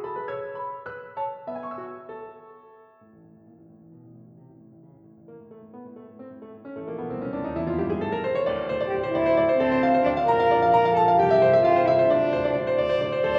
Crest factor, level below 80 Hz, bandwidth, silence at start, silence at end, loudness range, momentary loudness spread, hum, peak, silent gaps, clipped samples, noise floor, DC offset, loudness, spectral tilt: 16 dB; -54 dBFS; 6.6 kHz; 0 s; 0 s; 21 LU; 23 LU; none; -8 dBFS; none; under 0.1%; -53 dBFS; under 0.1%; -23 LUFS; -8 dB/octave